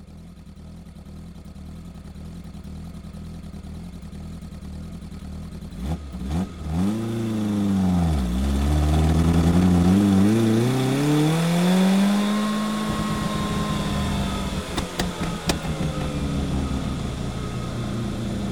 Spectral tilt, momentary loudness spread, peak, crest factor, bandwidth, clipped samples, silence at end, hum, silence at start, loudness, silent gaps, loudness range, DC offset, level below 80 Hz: -6.5 dB/octave; 21 LU; -6 dBFS; 18 dB; 16.5 kHz; under 0.1%; 0 s; none; 0 s; -23 LUFS; none; 19 LU; 0.4%; -32 dBFS